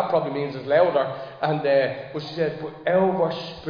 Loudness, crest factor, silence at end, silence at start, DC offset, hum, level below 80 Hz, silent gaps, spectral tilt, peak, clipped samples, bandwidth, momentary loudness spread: -23 LUFS; 16 dB; 0 s; 0 s; under 0.1%; none; -62 dBFS; none; -7.5 dB/octave; -8 dBFS; under 0.1%; 5.2 kHz; 9 LU